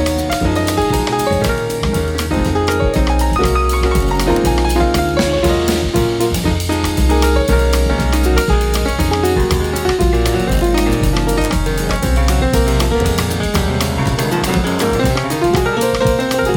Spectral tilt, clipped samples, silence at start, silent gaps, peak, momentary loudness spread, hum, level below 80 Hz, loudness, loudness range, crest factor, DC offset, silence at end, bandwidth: -5.5 dB/octave; under 0.1%; 0 s; none; -2 dBFS; 3 LU; none; -18 dBFS; -15 LUFS; 1 LU; 12 dB; under 0.1%; 0 s; 18.5 kHz